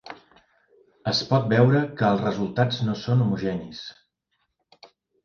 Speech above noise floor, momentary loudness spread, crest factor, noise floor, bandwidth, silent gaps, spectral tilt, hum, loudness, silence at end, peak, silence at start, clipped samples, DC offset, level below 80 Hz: 53 dB; 19 LU; 20 dB; -75 dBFS; 7 kHz; none; -7 dB/octave; none; -23 LUFS; 0.4 s; -4 dBFS; 0.05 s; under 0.1%; under 0.1%; -58 dBFS